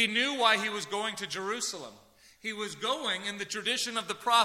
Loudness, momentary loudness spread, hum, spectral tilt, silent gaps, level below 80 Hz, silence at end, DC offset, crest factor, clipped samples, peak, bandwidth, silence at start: -30 LUFS; 11 LU; none; -1.5 dB/octave; none; -76 dBFS; 0 s; under 0.1%; 22 dB; under 0.1%; -10 dBFS; 16 kHz; 0 s